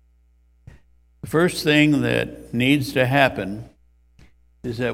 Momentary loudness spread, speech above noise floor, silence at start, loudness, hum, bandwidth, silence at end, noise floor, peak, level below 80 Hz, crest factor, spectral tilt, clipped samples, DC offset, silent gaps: 16 LU; 38 dB; 1.25 s; -20 LUFS; none; 16.5 kHz; 0 s; -58 dBFS; 0 dBFS; -50 dBFS; 22 dB; -5.5 dB/octave; under 0.1%; under 0.1%; none